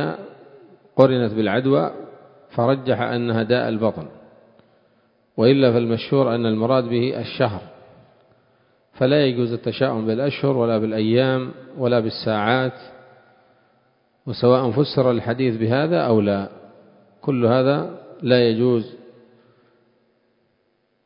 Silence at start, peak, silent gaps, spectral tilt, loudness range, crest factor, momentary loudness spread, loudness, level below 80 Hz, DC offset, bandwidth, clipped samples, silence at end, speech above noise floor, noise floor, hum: 0 s; 0 dBFS; none; -10 dB/octave; 3 LU; 22 dB; 13 LU; -20 LUFS; -58 dBFS; under 0.1%; 5.4 kHz; under 0.1%; 1.95 s; 48 dB; -67 dBFS; none